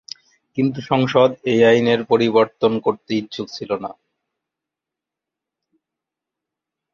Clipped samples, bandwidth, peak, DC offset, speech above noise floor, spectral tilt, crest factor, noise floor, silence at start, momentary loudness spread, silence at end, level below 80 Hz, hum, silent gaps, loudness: under 0.1%; 7.2 kHz; -2 dBFS; under 0.1%; 68 dB; -6.5 dB/octave; 18 dB; -86 dBFS; 0.55 s; 15 LU; 3 s; -62 dBFS; none; none; -18 LUFS